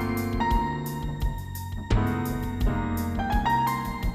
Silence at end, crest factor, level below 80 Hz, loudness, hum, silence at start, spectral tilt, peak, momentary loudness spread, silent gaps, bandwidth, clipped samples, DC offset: 0 s; 16 dB; -32 dBFS; -28 LUFS; none; 0 s; -6.5 dB/octave; -10 dBFS; 8 LU; none; 15.5 kHz; under 0.1%; under 0.1%